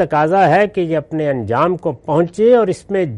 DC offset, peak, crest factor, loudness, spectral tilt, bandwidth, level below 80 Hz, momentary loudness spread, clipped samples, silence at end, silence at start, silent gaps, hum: under 0.1%; -2 dBFS; 12 dB; -15 LUFS; -7.5 dB/octave; 11 kHz; -52 dBFS; 7 LU; under 0.1%; 0 s; 0 s; none; none